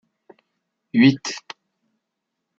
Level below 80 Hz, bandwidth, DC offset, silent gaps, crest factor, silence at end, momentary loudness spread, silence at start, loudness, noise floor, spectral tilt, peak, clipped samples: -66 dBFS; 7.8 kHz; under 0.1%; none; 22 dB; 1.2 s; 25 LU; 0.95 s; -19 LUFS; -80 dBFS; -5 dB/octave; -2 dBFS; under 0.1%